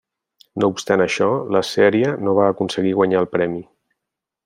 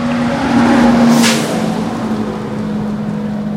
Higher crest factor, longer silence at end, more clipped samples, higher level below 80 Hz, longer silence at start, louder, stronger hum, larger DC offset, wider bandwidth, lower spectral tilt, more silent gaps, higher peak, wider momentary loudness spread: about the same, 16 dB vs 14 dB; first, 0.85 s vs 0 s; neither; second, -62 dBFS vs -38 dBFS; first, 0.55 s vs 0 s; second, -18 LUFS vs -13 LUFS; neither; neither; about the same, 15 kHz vs 16 kHz; about the same, -5.5 dB/octave vs -5 dB/octave; neither; about the same, -2 dBFS vs 0 dBFS; second, 6 LU vs 10 LU